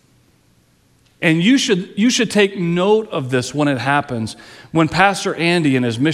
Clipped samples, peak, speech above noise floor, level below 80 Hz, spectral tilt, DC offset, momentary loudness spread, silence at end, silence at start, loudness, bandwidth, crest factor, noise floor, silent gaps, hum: under 0.1%; 0 dBFS; 40 dB; -54 dBFS; -5 dB/octave; under 0.1%; 7 LU; 0 s; 1.2 s; -16 LUFS; 13.5 kHz; 16 dB; -56 dBFS; none; none